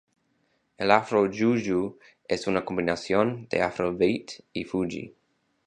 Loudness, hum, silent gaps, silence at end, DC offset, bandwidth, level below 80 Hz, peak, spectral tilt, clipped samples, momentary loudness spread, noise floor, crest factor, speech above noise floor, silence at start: -26 LUFS; none; none; 0.6 s; under 0.1%; 9.6 kHz; -58 dBFS; -2 dBFS; -6 dB/octave; under 0.1%; 12 LU; -71 dBFS; 24 dB; 45 dB; 0.8 s